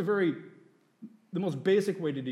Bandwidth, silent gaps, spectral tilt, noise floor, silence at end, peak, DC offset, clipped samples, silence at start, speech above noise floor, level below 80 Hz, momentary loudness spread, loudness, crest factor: 12.5 kHz; none; -7 dB/octave; -60 dBFS; 0 s; -14 dBFS; under 0.1%; under 0.1%; 0 s; 31 dB; -86 dBFS; 10 LU; -30 LUFS; 16 dB